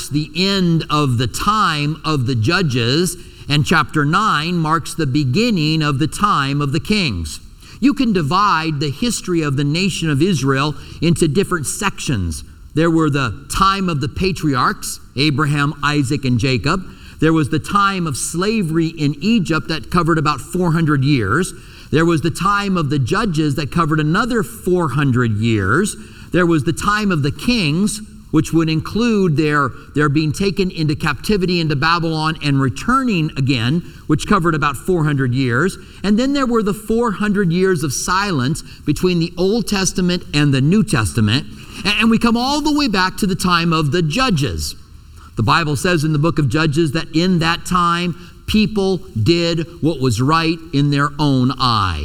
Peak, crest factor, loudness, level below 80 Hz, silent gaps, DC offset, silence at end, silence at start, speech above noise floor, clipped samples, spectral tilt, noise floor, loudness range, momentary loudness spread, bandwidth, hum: 0 dBFS; 16 dB; -17 LUFS; -36 dBFS; none; under 0.1%; 0 s; 0 s; 23 dB; under 0.1%; -5.5 dB/octave; -39 dBFS; 2 LU; 5 LU; 16.5 kHz; none